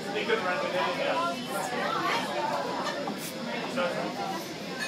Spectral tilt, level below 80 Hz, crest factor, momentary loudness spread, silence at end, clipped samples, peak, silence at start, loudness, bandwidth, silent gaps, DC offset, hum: -3.5 dB/octave; -74 dBFS; 16 dB; 6 LU; 0 s; under 0.1%; -14 dBFS; 0 s; -30 LUFS; 16 kHz; none; under 0.1%; none